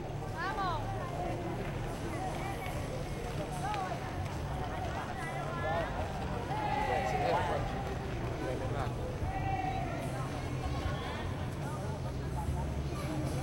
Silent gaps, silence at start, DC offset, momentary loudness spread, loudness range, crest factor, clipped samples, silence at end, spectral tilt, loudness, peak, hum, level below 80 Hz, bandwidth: none; 0 s; under 0.1%; 6 LU; 3 LU; 16 dB; under 0.1%; 0 s; -6 dB/octave; -36 LUFS; -18 dBFS; none; -44 dBFS; 16.5 kHz